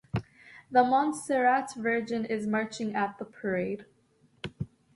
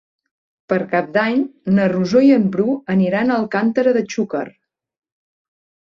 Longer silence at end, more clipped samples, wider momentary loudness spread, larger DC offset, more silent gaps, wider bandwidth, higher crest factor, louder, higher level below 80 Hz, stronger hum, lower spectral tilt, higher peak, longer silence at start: second, 0.3 s vs 1.45 s; neither; first, 14 LU vs 9 LU; neither; neither; first, 11.5 kHz vs 7.4 kHz; about the same, 20 dB vs 16 dB; second, -29 LUFS vs -17 LUFS; about the same, -60 dBFS vs -60 dBFS; neither; second, -5.5 dB/octave vs -7.5 dB/octave; second, -10 dBFS vs -2 dBFS; second, 0.15 s vs 0.7 s